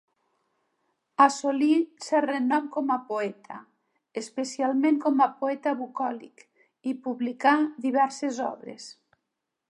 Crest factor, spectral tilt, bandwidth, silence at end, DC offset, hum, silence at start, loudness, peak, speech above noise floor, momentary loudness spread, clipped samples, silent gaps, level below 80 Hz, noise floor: 20 dB; -3.5 dB/octave; 11.5 kHz; 0.8 s; under 0.1%; none; 1.2 s; -26 LUFS; -6 dBFS; 57 dB; 17 LU; under 0.1%; none; -86 dBFS; -83 dBFS